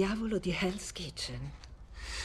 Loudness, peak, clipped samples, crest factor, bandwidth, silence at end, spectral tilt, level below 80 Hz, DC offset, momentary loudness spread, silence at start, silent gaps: -36 LUFS; -18 dBFS; under 0.1%; 18 dB; 13.5 kHz; 0 s; -4.5 dB/octave; -48 dBFS; under 0.1%; 16 LU; 0 s; none